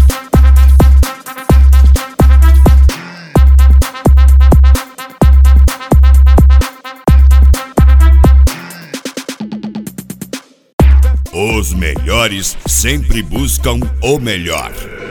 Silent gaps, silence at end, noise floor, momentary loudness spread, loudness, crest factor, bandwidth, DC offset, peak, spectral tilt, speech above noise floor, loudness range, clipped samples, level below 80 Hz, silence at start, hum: 10.73-10.78 s; 0 s; -29 dBFS; 17 LU; -10 LUFS; 8 dB; 17 kHz; under 0.1%; 0 dBFS; -5.5 dB/octave; 15 dB; 6 LU; under 0.1%; -8 dBFS; 0 s; none